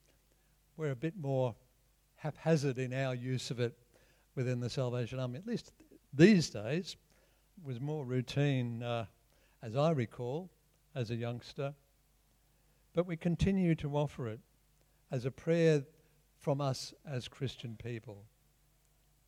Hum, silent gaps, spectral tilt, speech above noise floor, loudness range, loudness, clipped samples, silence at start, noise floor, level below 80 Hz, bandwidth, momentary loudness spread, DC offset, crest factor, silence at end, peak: none; none; -6.5 dB/octave; 37 dB; 6 LU; -35 LUFS; under 0.1%; 0.8 s; -71 dBFS; -60 dBFS; 13.5 kHz; 15 LU; under 0.1%; 24 dB; 1 s; -12 dBFS